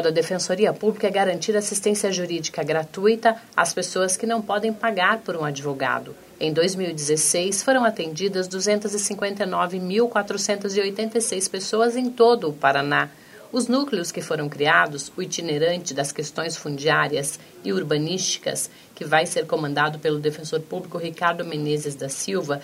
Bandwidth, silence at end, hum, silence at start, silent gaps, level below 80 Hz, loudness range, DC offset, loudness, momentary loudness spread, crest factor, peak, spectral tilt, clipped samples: 16 kHz; 0 s; none; 0 s; none; -70 dBFS; 3 LU; under 0.1%; -23 LUFS; 9 LU; 20 dB; -2 dBFS; -3.5 dB/octave; under 0.1%